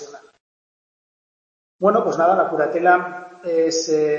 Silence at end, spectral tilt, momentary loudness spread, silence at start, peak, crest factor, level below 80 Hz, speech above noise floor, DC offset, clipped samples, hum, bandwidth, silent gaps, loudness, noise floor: 0 s; -4 dB/octave; 7 LU; 0 s; -2 dBFS; 18 dB; -74 dBFS; over 72 dB; under 0.1%; under 0.1%; none; 7.6 kHz; 0.40-1.79 s; -18 LUFS; under -90 dBFS